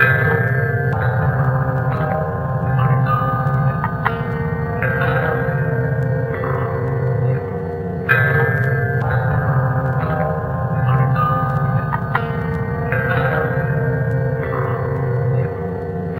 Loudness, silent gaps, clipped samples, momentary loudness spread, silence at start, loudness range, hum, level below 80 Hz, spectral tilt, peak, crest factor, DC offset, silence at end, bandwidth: -19 LUFS; none; under 0.1%; 5 LU; 0 s; 2 LU; none; -36 dBFS; -10 dB/octave; 0 dBFS; 18 dB; under 0.1%; 0 s; 13.5 kHz